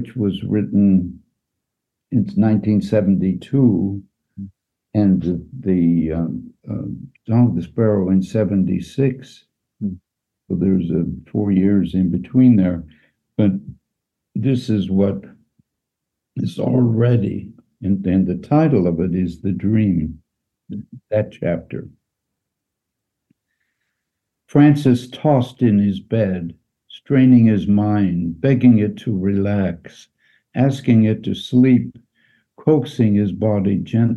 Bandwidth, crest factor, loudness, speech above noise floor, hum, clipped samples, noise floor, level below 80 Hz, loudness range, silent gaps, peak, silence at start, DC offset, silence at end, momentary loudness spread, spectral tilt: 8 kHz; 16 dB; -18 LUFS; 64 dB; none; under 0.1%; -81 dBFS; -48 dBFS; 6 LU; none; -2 dBFS; 0 s; under 0.1%; 0 s; 15 LU; -9.5 dB/octave